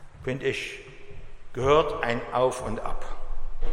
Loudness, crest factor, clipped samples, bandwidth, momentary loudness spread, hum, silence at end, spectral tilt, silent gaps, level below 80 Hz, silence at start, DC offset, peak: -27 LUFS; 18 dB; under 0.1%; 11 kHz; 20 LU; none; 0 s; -5 dB/octave; none; -34 dBFS; 0 s; under 0.1%; -8 dBFS